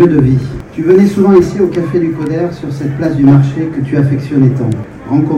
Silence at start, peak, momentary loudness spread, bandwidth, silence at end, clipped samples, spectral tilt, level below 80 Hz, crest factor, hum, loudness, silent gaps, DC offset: 0 s; 0 dBFS; 10 LU; 9.2 kHz; 0 s; 0.8%; -9.5 dB/octave; -36 dBFS; 10 dB; none; -11 LUFS; none; under 0.1%